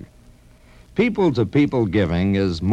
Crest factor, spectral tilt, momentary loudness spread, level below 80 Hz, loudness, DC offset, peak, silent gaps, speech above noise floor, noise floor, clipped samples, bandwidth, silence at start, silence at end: 14 dB; -8 dB/octave; 3 LU; -42 dBFS; -20 LUFS; under 0.1%; -6 dBFS; none; 30 dB; -48 dBFS; under 0.1%; 9.6 kHz; 0 s; 0 s